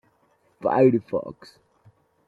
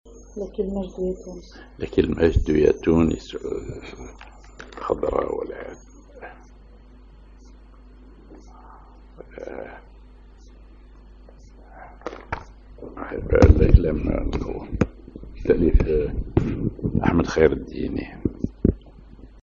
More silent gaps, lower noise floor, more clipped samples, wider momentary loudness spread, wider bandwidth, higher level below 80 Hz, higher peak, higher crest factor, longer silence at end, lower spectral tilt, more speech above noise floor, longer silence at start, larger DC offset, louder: neither; first, -65 dBFS vs -47 dBFS; neither; second, 13 LU vs 23 LU; second, 5 kHz vs 7.4 kHz; second, -66 dBFS vs -30 dBFS; second, -6 dBFS vs 0 dBFS; about the same, 20 dB vs 24 dB; first, 0.95 s vs 0.15 s; about the same, -9.5 dB/octave vs -8.5 dB/octave; first, 42 dB vs 25 dB; first, 0.6 s vs 0.05 s; neither; about the same, -22 LUFS vs -23 LUFS